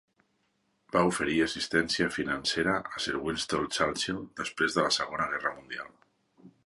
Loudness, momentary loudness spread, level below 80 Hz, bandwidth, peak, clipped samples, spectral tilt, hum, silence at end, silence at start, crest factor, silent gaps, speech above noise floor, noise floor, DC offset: -29 LUFS; 8 LU; -58 dBFS; 11.5 kHz; -10 dBFS; under 0.1%; -3.5 dB/octave; none; 0.2 s; 0.95 s; 20 dB; none; 44 dB; -74 dBFS; under 0.1%